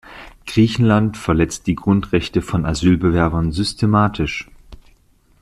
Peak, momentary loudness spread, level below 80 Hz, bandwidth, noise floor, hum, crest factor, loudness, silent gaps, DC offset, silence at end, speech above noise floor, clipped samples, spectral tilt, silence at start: -2 dBFS; 8 LU; -36 dBFS; 13 kHz; -54 dBFS; none; 16 dB; -18 LUFS; none; under 0.1%; 0.65 s; 38 dB; under 0.1%; -6.5 dB/octave; 0.05 s